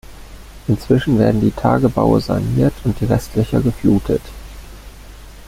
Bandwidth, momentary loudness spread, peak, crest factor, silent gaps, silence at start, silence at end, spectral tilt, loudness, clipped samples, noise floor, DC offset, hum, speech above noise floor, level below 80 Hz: 16 kHz; 13 LU; -2 dBFS; 16 dB; none; 0.1 s; 0 s; -8 dB/octave; -17 LUFS; under 0.1%; -36 dBFS; under 0.1%; none; 21 dB; -34 dBFS